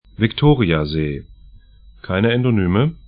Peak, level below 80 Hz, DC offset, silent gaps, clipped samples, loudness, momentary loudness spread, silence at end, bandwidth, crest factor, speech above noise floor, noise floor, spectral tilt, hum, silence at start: 0 dBFS; -36 dBFS; under 0.1%; none; under 0.1%; -18 LUFS; 9 LU; 0.1 s; 5.2 kHz; 18 dB; 28 dB; -45 dBFS; -12.5 dB/octave; none; 0.2 s